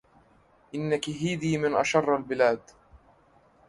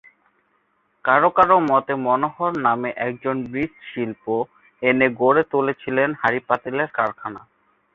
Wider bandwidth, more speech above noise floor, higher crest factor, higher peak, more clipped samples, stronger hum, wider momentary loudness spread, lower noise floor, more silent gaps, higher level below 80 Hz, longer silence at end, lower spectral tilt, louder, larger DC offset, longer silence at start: first, 11.5 kHz vs 6.8 kHz; second, 35 dB vs 46 dB; about the same, 22 dB vs 20 dB; second, -8 dBFS vs -2 dBFS; neither; neither; about the same, 10 LU vs 12 LU; second, -61 dBFS vs -66 dBFS; neither; about the same, -62 dBFS vs -60 dBFS; first, 0.7 s vs 0.55 s; second, -5.5 dB/octave vs -8 dB/octave; second, -27 LUFS vs -20 LUFS; neither; second, 0.75 s vs 1.05 s